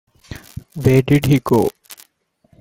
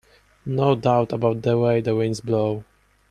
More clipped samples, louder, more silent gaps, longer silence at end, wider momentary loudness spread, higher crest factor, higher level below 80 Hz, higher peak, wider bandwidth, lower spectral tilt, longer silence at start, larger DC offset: neither; first, -16 LUFS vs -21 LUFS; neither; first, 0.65 s vs 0.5 s; first, 21 LU vs 8 LU; about the same, 16 dB vs 18 dB; first, -44 dBFS vs -56 dBFS; about the same, -2 dBFS vs -4 dBFS; first, 17 kHz vs 10.5 kHz; about the same, -7 dB/octave vs -7.5 dB/octave; second, 0.3 s vs 0.45 s; neither